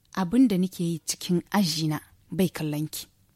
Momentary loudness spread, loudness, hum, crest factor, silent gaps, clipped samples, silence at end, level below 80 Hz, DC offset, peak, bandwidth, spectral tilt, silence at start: 12 LU; -26 LUFS; none; 16 dB; none; under 0.1%; 0.3 s; -60 dBFS; under 0.1%; -12 dBFS; 16.5 kHz; -5 dB/octave; 0.15 s